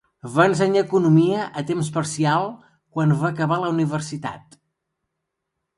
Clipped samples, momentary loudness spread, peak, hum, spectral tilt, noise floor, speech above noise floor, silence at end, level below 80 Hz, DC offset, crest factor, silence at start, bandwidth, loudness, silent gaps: under 0.1%; 13 LU; -2 dBFS; none; -6.5 dB/octave; -80 dBFS; 60 dB; 1.4 s; -62 dBFS; under 0.1%; 18 dB; 0.25 s; 11.5 kHz; -21 LUFS; none